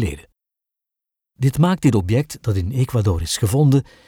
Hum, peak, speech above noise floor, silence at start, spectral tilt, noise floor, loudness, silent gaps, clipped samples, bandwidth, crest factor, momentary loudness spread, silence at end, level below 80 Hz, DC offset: none; -4 dBFS; 68 dB; 0 s; -6.5 dB/octave; -86 dBFS; -19 LUFS; none; under 0.1%; 17.5 kHz; 16 dB; 7 LU; 0.25 s; -38 dBFS; under 0.1%